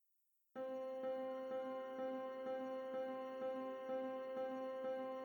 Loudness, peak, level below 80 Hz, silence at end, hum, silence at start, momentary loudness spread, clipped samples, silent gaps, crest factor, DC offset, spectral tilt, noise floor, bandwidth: -46 LUFS; -34 dBFS; under -90 dBFS; 0 s; none; 0.55 s; 2 LU; under 0.1%; none; 12 dB; under 0.1%; -5.5 dB/octave; -81 dBFS; 19 kHz